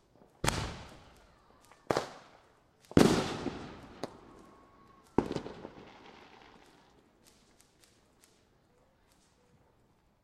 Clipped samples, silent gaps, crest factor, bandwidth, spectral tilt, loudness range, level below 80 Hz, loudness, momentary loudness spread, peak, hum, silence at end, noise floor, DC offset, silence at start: under 0.1%; none; 36 dB; 16 kHz; -5 dB/octave; 9 LU; -54 dBFS; -33 LUFS; 29 LU; -2 dBFS; none; 4.15 s; -69 dBFS; under 0.1%; 0.45 s